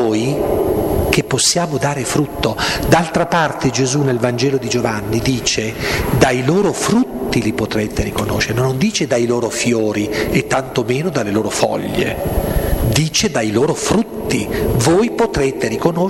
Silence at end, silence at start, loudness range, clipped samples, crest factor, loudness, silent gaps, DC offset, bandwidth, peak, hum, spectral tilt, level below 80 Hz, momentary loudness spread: 0 s; 0 s; 1 LU; under 0.1%; 16 dB; -16 LUFS; none; 0.2%; 16.5 kHz; 0 dBFS; none; -4.5 dB/octave; -30 dBFS; 5 LU